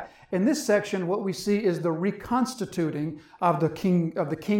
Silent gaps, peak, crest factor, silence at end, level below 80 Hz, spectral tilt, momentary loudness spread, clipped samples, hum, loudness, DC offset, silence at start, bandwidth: none; -10 dBFS; 16 dB; 0 s; -60 dBFS; -6 dB/octave; 5 LU; under 0.1%; none; -26 LUFS; under 0.1%; 0 s; 17 kHz